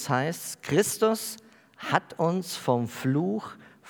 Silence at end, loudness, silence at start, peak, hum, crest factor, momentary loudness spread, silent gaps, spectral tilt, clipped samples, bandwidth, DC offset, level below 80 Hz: 0 s; -28 LUFS; 0 s; -4 dBFS; none; 24 dB; 11 LU; none; -5 dB/octave; under 0.1%; over 20 kHz; under 0.1%; -74 dBFS